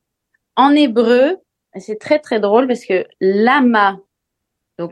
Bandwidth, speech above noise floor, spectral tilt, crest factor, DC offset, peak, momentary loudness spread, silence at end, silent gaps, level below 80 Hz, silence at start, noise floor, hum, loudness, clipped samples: 10 kHz; 63 dB; -6 dB/octave; 16 dB; under 0.1%; 0 dBFS; 16 LU; 0 s; none; -68 dBFS; 0.55 s; -77 dBFS; none; -14 LUFS; under 0.1%